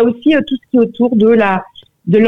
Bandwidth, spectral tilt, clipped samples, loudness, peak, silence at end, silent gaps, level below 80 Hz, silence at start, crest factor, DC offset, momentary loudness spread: 4 kHz; -8.5 dB/octave; under 0.1%; -13 LUFS; -2 dBFS; 0 s; none; -54 dBFS; 0 s; 10 dB; under 0.1%; 7 LU